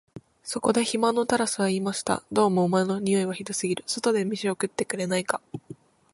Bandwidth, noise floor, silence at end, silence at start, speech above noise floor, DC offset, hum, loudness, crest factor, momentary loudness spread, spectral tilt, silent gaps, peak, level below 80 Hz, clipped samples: 11.5 kHz; -47 dBFS; 0.4 s; 0.15 s; 22 dB; under 0.1%; none; -25 LUFS; 20 dB; 7 LU; -4.5 dB/octave; none; -6 dBFS; -64 dBFS; under 0.1%